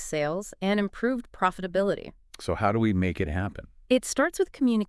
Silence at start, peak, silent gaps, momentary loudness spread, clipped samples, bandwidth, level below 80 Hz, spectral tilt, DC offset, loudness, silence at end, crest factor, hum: 0 s; -8 dBFS; none; 9 LU; under 0.1%; 12 kHz; -48 dBFS; -5.5 dB/octave; under 0.1%; -27 LUFS; 0.05 s; 18 dB; none